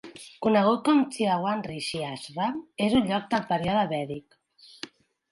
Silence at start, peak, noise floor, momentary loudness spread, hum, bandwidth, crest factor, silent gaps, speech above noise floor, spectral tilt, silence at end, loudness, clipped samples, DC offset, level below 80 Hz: 0.05 s; -8 dBFS; -46 dBFS; 19 LU; none; 11.5 kHz; 18 dB; none; 20 dB; -5.5 dB/octave; 0.45 s; -26 LUFS; under 0.1%; under 0.1%; -58 dBFS